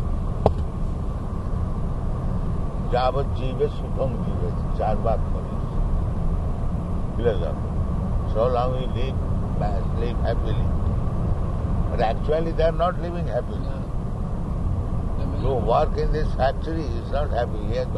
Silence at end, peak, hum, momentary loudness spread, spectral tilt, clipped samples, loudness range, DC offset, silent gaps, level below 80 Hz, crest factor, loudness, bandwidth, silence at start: 0 s; -2 dBFS; none; 6 LU; -8.5 dB/octave; under 0.1%; 2 LU; under 0.1%; none; -26 dBFS; 22 dB; -25 LUFS; 6.2 kHz; 0 s